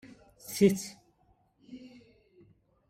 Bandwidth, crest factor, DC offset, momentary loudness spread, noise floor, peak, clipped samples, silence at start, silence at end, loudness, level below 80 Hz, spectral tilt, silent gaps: 16 kHz; 24 dB; under 0.1%; 25 LU; -69 dBFS; -10 dBFS; under 0.1%; 0.45 s; 1 s; -28 LUFS; -68 dBFS; -5.5 dB/octave; none